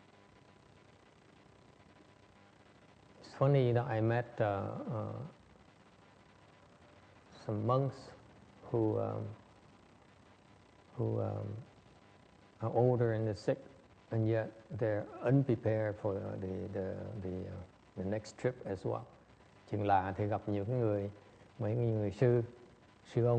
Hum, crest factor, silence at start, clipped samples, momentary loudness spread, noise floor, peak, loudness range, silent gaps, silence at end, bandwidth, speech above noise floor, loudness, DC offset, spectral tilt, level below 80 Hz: none; 20 dB; 3.2 s; under 0.1%; 16 LU; -63 dBFS; -16 dBFS; 7 LU; none; 0 s; 8.6 kHz; 28 dB; -36 LUFS; under 0.1%; -9 dB/octave; -68 dBFS